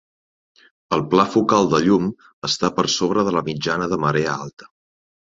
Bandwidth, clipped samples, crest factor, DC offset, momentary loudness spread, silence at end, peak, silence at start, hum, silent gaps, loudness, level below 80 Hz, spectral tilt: 7.8 kHz; under 0.1%; 20 dB; under 0.1%; 9 LU; 0.6 s; -2 dBFS; 0.9 s; none; 2.33-2.42 s, 4.53-4.57 s; -19 LUFS; -54 dBFS; -5 dB/octave